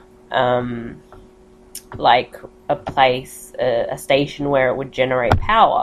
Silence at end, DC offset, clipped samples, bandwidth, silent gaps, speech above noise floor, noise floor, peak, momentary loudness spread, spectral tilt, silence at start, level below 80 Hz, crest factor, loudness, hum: 0 s; under 0.1%; under 0.1%; 14 kHz; none; 29 dB; -47 dBFS; 0 dBFS; 18 LU; -5 dB/octave; 0.3 s; -38 dBFS; 18 dB; -18 LUFS; none